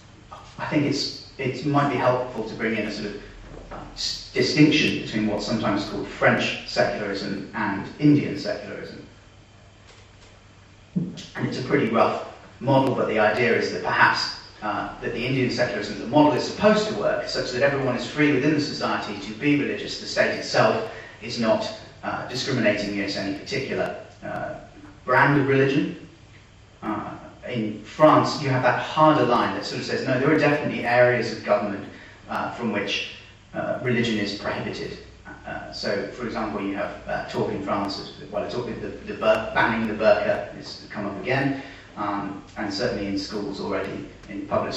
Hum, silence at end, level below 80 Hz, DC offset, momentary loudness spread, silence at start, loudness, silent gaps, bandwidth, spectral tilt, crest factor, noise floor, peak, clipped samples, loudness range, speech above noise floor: none; 0 s; -52 dBFS; under 0.1%; 15 LU; 0.3 s; -24 LUFS; none; 8.4 kHz; -5.5 dB/octave; 20 dB; -50 dBFS; -4 dBFS; under 0.1%; 7 LU; 26 dB